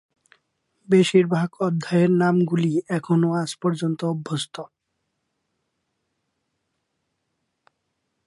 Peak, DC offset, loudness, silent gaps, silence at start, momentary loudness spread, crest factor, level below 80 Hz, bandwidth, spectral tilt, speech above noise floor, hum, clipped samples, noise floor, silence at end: -4 dBFS; under 0.1%; -21 LUFS; none; 0.9 s; 10 LU; 20 dB; -70 dBFS; 11.5 kHz; -6.5 dB/octave; 56 dB; none; under 0.1%; -77 dBFS; 3.6 s